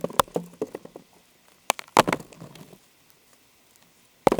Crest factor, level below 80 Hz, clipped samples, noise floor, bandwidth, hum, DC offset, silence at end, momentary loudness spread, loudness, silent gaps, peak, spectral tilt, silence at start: 28 dB; -58 dBFS; under 0.1%; -59 dBFS; over 20 kHz; none; under 0.1%; 0 s; 24 LU; -26 LUFS; none; 0 dBFS; -3.5 dB/octave; 0.05 s